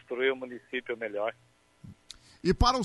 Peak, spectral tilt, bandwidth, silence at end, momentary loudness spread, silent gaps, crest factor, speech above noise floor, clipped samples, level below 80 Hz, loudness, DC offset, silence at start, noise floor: -10 dBFS; -5 dB/octave; 11.5 kHz; 0 s; 23 LU; none; 22 dB; 24 dB; under 0.1%; -40 dBFS; -31 LUFS; under 0.1%; 0.1 s; -54 dBFS